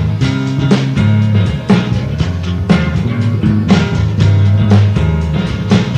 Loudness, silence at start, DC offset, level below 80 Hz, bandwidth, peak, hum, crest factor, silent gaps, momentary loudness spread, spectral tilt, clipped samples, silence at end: -13 LUFS; 0 s; under 0.1%; -26 dBFS; 8.8 kHz; 0 dBFS; none; 12 dB; none; 6 LU; -7.5 dB/octave; under 0.1%; 0 s